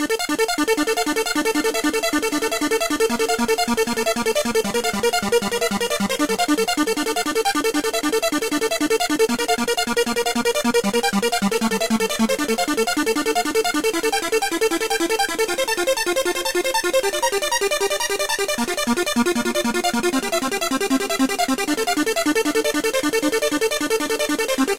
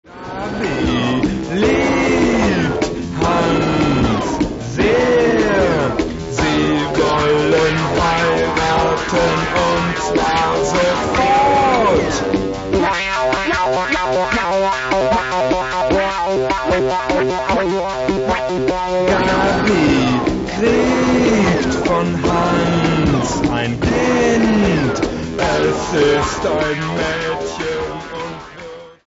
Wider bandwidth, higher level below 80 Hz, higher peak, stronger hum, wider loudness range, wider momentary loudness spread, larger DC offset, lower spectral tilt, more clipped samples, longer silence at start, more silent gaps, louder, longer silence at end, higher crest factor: first, 17 kHz vs 8 kHz; second, -50 dBFS vs -34 dBFS; second, -8 dBFS vs -2 dBFS; neither; about the same, 1 LU vs 2 LU; second, 2 LU vs 6 LU; first, 0.8% vs under 0.1%; second, -2.5 dB/octave vs -5.5 dB/octave; neither; about the same, 0 s vs 0.1 s; neither; second, -20 LUFS vs -16 LUFS; second, 0 s vs 0.15 s; about the same, 12 dB vs 14 dB